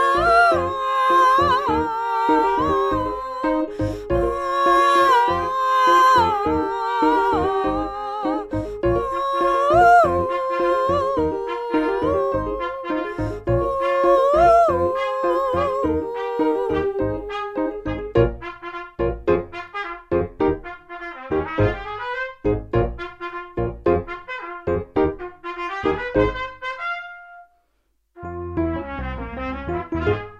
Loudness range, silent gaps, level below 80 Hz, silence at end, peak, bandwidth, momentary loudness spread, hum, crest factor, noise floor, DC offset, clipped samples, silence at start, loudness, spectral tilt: 8 LU; none; -38 dBFS; 0 s; -4 dBFS; 13.5 kHz; 15 LU; none; 16 dB; -67 dBFS; under 0.1%; under 0.1%; 0 s; -20 LUFS; -6.5 dB/octave